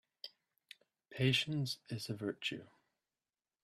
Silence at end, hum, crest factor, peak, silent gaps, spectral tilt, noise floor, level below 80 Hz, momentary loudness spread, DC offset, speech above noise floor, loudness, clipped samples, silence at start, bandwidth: 1 s; none; 22 dB; -20 dBFS; none; -5 dB/octave; under -90 dBFS; -74 dBFS; 26 LU; under 0.1%; over 52 dB; -37 LUFS; under 0.1%; 0.25 s; 13.5 kHz